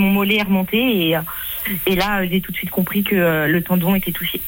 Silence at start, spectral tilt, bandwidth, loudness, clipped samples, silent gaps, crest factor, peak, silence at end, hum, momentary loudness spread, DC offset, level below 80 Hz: 0 s; -5.5 dB/octave; 17 kHz; -18 LUFS; under 0.1%; none; 12 dB; -6 dBFS; 0 s; none; 5 LU; under 0.1%; -42 dBFS